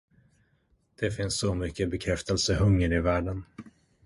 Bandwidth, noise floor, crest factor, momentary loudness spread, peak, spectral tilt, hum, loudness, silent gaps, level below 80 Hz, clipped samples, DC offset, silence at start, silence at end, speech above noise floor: 11.5 kHz; -69 dBFS; 16 dB; 13 LU; -12 dBFS; -5 dB/octave; none; -28 LUFS; none; -40 dBFS; under 0.1%; under 0.1%; 1 s; 0.35 s; 42 dB